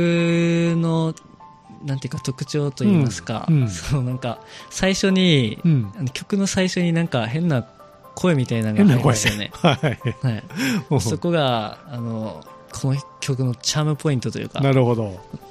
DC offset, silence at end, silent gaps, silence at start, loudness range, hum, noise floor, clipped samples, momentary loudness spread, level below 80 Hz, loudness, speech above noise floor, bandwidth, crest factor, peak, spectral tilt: under 0.1%; 0 s; none; 0 s; 4 LU; none; -44 dBFS; under 0.1%; 12 LU; -48 dBFS; -21 LUFS; 24 dB; 14 kHz; 18 dB; -2 dBFS; -5.5 dB/octave